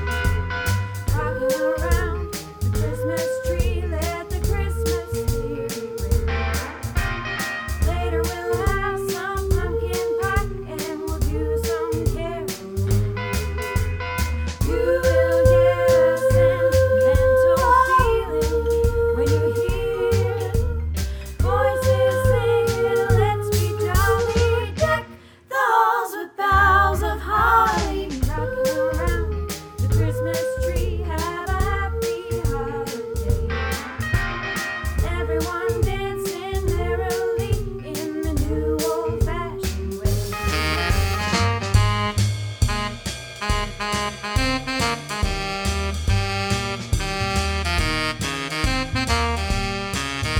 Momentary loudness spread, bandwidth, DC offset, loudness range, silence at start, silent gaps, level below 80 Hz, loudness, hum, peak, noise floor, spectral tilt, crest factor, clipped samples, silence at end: 9 LU; over 20 kHz; under 0.1%; 7 LU; 0 s; none; -28 dBFS; -22 LUFS; none; -4 dBFS; -42 dBFS; -5 dB/octave; 18 dB; under 0.1%; 0 s